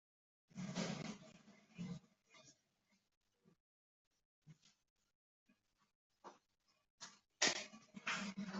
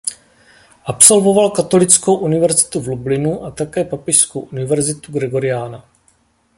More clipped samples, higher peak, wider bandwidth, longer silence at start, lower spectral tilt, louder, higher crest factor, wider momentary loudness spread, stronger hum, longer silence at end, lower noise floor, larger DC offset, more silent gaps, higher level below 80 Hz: second, under 0.1% vs 0.2%; second, -20 dBFS vs 0 dBFS; second, 8.2 kHz vs 16 kHz; first, 0.55 s vs 0.05 s; second, -2.5 dB/octave vs -4 dB/octave; second, -44 LUFS vs -14 LUFS; first, 30 dB vs 16 dB; first, 26 LU vs 15 LU; neither; second, 0 s vs 0.75 s; first, -83 dBFS vs -57 dBFS; neither; first, 3.17-3.21 s, 3.60-4.11 s, 4.25-4.42 s, 4.90-4.96 s, 5.15-5.46 s, 5.95-6.10 s, 6.90-6.98 s vs none; second, -86 dBFS vs -50 dBFS